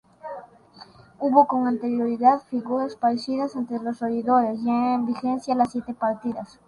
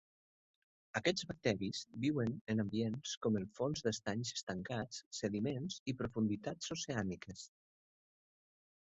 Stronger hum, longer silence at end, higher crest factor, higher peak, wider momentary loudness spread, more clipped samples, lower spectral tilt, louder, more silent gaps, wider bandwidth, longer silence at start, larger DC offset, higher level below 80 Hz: neither; second, 0.25 s vs 1.45 s; about the same, 20 dB vs 22 dB; first, -2 dBFS vs -18 dBFS; first, 10 LU vs 6 LU; neither; first, -6.5 dB/octave vs -5 dB/octave; first, -23 LUFS vs -40 LUFS; second, none vs 2.41-2.47 s, 3.17-3.21 s, 4.43-4.47 s, 5.06-5.11 s, 5.80-5.86 s; first, 11 kHz vs 8 kHz; second, 0.25 s vs 0.95 s; neither; about the same, -66 dBFS vs -68 dBFS